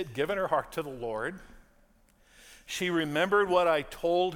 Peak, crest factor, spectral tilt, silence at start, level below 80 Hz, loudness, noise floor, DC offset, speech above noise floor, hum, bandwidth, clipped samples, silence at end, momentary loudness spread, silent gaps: -12 dBFS; 18 dB; -4.5 dB/octave; 0 s; -58 dBFS; -29 LUFS; -63 dBFS; under 0.1%; 34 dB; none; 17.5 kHz; under 0.1%; 0 s; 13 LU; none